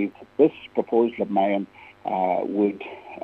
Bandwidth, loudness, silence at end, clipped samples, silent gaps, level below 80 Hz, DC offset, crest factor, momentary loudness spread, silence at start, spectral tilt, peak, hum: 4.6 kHz; -24 LUFS; 0 s; under 0.1%; none; -68 dBFS; under 0.1%; 18 dB; 14 LU; 0 s; -9 dB/octave; -6 dBFS; none